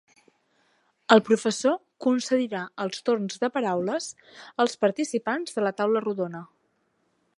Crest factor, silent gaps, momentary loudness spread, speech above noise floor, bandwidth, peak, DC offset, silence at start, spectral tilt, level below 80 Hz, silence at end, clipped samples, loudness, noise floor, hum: 24 dB; none; 12 LU; 46 dB; 11.5 kHz; -2 dBFS; under 0.1%; 1.1 s; -4.5 dB/octave; -78 dBFS; 0.95 s; under 0.1%; -25 LUFS; -71 dBFS; none